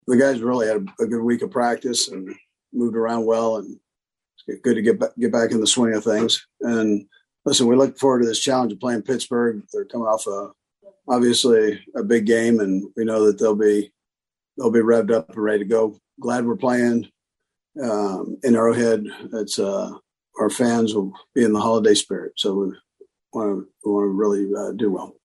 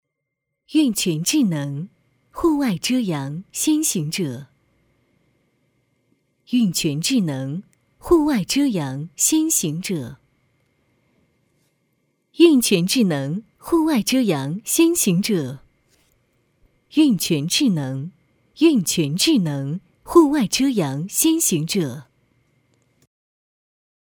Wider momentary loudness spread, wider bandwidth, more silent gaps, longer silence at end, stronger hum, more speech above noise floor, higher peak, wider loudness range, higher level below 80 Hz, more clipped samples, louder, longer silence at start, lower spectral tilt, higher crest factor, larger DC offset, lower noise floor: about the same, 11 LU vs 13 LU; second, 12.5 kHz vs over 20 kHz; neither; second, 0.15 s vs 2.05 s; neither; first, 69 dB vs 60 dB; second, -4 dBFS vs 0 dBFS; about the same, 4 LU vs 6 LU; second, -66 dBFS vs -54 dBFS; neither; about the same, -20 LUFS vs -19 LUFS; second, 0.05 s vs 0.7 s; about the same, -4 dB/octave vs -4 dB/octave; about the same, 18 dB vs 20 dB; neither; first, -89 dBFS vs -79 dBFS